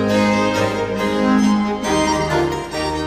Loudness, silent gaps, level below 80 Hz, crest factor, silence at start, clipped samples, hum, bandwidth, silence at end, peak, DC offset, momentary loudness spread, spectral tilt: -18 LUFS; none; -38 dBFS; 14 dB; 0 s; under 0.1%; none; 15.5 kHz; 0 s; -4 dBFS; 0.1%; 5 LU; -5 dB/octave